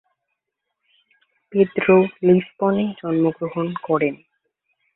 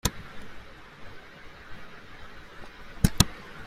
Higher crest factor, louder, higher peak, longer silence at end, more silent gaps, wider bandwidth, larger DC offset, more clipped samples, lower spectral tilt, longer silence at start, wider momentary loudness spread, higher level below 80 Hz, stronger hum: second, 18 dB vs 30 dB; first, -20 LUFS vs -26 LUFS; about the same, -2 dBFS vs -2 dBFS; first, 0.8 s vs 0 s; neither; second, 4 kHz vs 16 kHz; neither; neither; first, -12 dB/octave vs -4 dB/octave; first, 1.5 s vs 0.05 s; second, 10 LU vs 23 LU; second, -62 dBFS vs -40 dBFS; neither